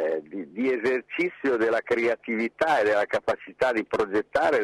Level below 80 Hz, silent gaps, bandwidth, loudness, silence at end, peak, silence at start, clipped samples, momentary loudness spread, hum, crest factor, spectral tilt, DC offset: -62 dBFS; none; 12.5 kHz; -25 LUFS; 0 s; -10 dBFS; 0 s; under 0.1%; 6 LU; none; 16 dB; -5 dB/octave; under 0.1%